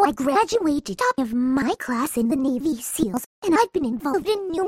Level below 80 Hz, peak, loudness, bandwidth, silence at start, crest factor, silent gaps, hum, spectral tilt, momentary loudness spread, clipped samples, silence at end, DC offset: -52 dBFS; -6 dBFS; -23 LUFS; 16.5 kHz; 0 s; 16 dB; 3.26-3.42 s; none; -4.5 dB/octave; 5 LU; under 0.1%; 0 s; under 0.1%